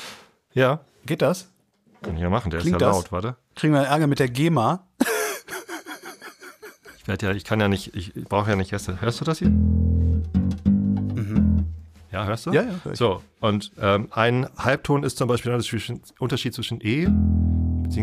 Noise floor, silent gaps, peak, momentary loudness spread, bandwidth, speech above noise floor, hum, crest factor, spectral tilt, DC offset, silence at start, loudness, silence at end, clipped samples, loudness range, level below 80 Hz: -52 dBFS; none; -4 dBFS; 13 LU; 15 kHz; 30 dB; none; 18 dB; -6.5 dB/octave; under 0.1%; 0 s; -23 LUFS; 0 s; under 0.1%; 4 LU; -34 dBFS